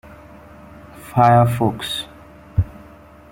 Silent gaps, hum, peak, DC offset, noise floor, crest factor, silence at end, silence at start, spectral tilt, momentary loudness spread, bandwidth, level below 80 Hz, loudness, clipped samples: none; none; -2 dBFS; under 0.1%; -43 dBFS; 18 dB; 0.65 s; 0.1 s; -6.5 dB/octave; 17 LU; 16.5 kHz; -40 dBFS; -18 LUFS; under 0.1%